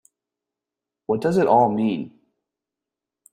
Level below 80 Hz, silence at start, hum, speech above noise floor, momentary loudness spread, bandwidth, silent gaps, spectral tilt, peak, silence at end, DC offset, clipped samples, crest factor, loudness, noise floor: -64 dBFS; 1.1 s; none; 68 dB; 19 LU; 13.5 kHz; none; -7.5 dB/octave; -4 dBFS; 1.25 s; under 0.1%; under 0.1%; 20 dB; -20 LUFS; -87 dBFS